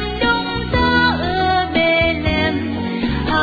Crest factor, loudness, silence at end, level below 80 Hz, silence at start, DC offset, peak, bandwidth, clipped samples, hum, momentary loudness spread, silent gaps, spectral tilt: 14 dB; -17 LUFS; 0 s; -30 dBFS; 0 s; under 0.1%; -4 dBFS; 5 kHz; under 0.1%; none; 6 LU; none; -7 dB/octave